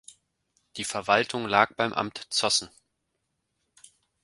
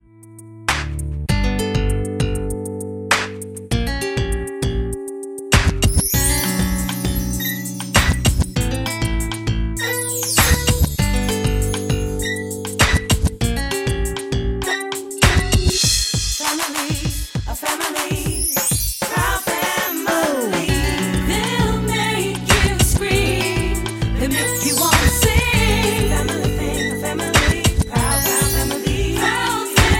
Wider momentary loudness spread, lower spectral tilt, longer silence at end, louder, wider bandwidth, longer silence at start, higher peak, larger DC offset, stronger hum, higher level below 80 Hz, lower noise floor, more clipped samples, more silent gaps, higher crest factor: first, 11 LU vs 8 LU; second, -2 dB/octave vs -3.5 dB/octave; first, 1.55 s vs 0 s; second, -25 LUFS vs -19 LUFS; second, 11.5 kHz vs 17 kHz; first, 0.75 s vs 0.2 s; about the same, -2 dBFS vs 0 dBFS; neither; neither; second, -66 dBFS vs -24 dBFS; first, -79 dBFS vs -41 dBFS; neither; neither; first, 28 dB vs 18 dB